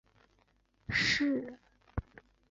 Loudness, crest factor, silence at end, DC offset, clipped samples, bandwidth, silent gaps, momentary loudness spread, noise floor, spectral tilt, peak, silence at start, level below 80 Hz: -32 LUFS; 20 dB; 0.5 s; under 0.1%; under 0.1%; 7.8 kHz; none; 18 LU; -71 dBFS; -4 dB/octave; -18 dBFS; 0.9 s; -52 dBFS